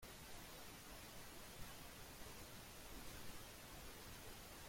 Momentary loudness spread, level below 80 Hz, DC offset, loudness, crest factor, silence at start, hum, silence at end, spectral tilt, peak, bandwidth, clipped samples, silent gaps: 1 LU; -64 dBFS; under 0.1%; -56 LUFS; 16 dB; 0 s; none; 0 s; -3 dB/octave; -40 dBFS; 16.5 kHz; under 0.1%; none